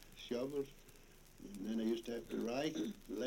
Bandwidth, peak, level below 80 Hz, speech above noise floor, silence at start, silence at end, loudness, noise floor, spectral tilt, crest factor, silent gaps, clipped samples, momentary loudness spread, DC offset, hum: 16.5 kHz; -26 dBFS; -64 dBFS; 20 dB; 0 s; 0 s; -42 LUFS; -61 dBFS; -5 dB/octave; 16 dB; none; under 0.1%; 22 LU; under 0.1%; none